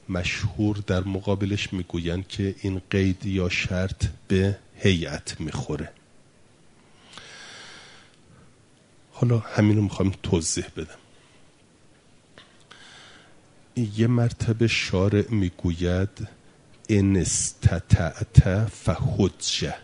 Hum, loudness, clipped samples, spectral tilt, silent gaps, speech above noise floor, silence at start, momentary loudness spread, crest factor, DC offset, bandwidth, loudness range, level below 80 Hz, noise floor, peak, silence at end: none; -24 LUFS; under 0.1%; -5.5 dB/octave; none; 33 dB; 0.1 s; 18 LU; 26 dB; under 0.1%; 11 kHz; 11 LU; -38 dBFS; -56 dBFS; 0 dBFS; 0 s